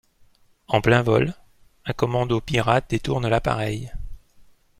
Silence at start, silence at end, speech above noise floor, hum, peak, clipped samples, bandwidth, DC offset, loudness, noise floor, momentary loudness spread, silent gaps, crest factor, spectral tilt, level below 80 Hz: 0.7 s; 0.35 s; 35 dB; none; -2 dBFS; under 0.1%; 14.5 kHz; under 0.1%; -22 LUFS; -56 dBFS; 16 LU; none; 20 dB; -6.5 dB/octave; -40 dBFS